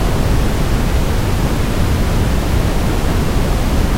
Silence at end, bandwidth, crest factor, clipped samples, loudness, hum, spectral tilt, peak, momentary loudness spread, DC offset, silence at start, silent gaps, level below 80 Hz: 0 s; 16 kHz; 10 dB; under 0.1%; -17 LUFS; none; -6 dB/octave; -2 dBFS; 1 LU; under 0.1%; 0 s; none; -16 dBFS